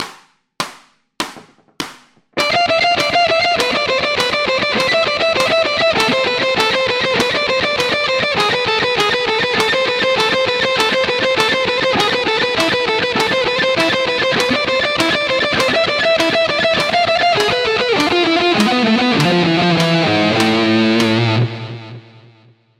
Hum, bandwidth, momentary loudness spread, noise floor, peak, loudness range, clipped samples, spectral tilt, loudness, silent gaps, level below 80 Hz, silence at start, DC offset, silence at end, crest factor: none; 16 kHz; 3 LU; -49 dBFS; 0 dBFS; 2 LU; under 0.1%; -4 dB/octave; -14 LUFS; none; -50 dBFS; 0 s; under 0.1%; 0.8 s; 16 dB